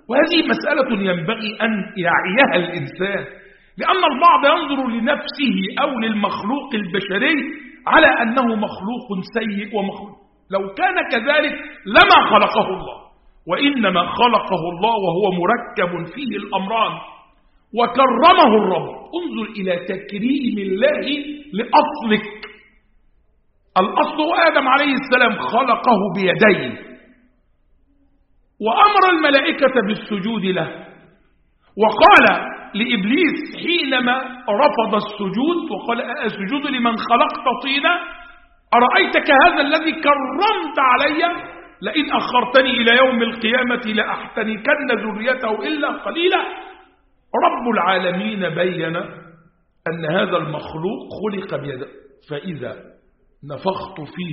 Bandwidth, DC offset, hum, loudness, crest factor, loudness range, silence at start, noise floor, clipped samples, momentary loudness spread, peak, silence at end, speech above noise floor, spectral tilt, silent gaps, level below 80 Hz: 5.8 kHz; under 0.1%; none; -17 LUFS; 18 dB; 6 LU; 0.1 s; -58 dBFS; under 0.1%; 15 LU; 0 dBFS; 0 s; 41 dB; -2 dB/octave; none; -54 dBFS